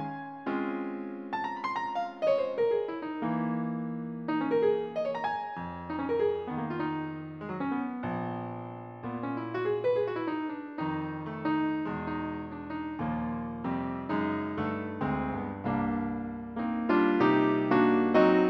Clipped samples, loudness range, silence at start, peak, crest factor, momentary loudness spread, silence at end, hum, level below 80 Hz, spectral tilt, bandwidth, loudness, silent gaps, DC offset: under 0.1%; 5 LU; 0 s; -10 dBFS; 20 dB; 12 LU; 0 s; none; -58 dBFS; -8.5 dB/octave; 6.2 kHz; -31 LUFS; none; under 0.1%